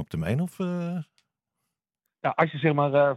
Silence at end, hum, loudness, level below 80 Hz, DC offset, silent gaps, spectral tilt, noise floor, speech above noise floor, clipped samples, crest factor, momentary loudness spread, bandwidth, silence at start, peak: 0 s; none; -26 LUFS; -60 dBFS; under 0.1%; none; -8 dB/octave; -84 dBFS; 59 dB; under 0.1%; 20 dB; 11 LU; 13.5 kHz; 0 s; -6 dBFS